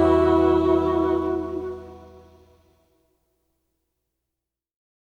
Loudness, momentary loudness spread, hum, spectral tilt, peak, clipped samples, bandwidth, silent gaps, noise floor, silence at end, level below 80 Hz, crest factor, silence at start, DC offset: -21 LUFS; 18 LU; none; -8.5 dB/octave; -6 dBFS; under 0.1%; 7.4 kHz; none; -85 dBFS; 3 s; -44 dBFS; 18 dB; 0 s; under 0.1%